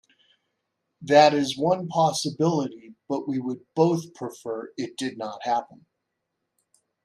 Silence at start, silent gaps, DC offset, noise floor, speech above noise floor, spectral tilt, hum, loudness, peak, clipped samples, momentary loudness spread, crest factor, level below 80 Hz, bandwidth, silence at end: 1 s; none; under 0.1%; -80 dBFS; 57 dB; -5 dB/octave; none; -24 LUFS; -4 dBFS; under 0.1%; 16 LU; 22 dB; -72 dBFS; 13.5 kHz; 1.4 s